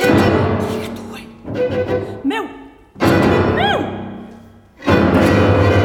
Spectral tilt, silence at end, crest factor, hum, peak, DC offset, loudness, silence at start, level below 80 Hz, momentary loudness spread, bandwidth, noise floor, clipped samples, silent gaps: -7 dB/octave; 0 s; 16 dB; none; 0 dBFS; under 0.1%; -16 LUFS; 0 s; -36 dBFS; 17 LU; 16.5 kHz; -41 dBFS; under 0.1%; none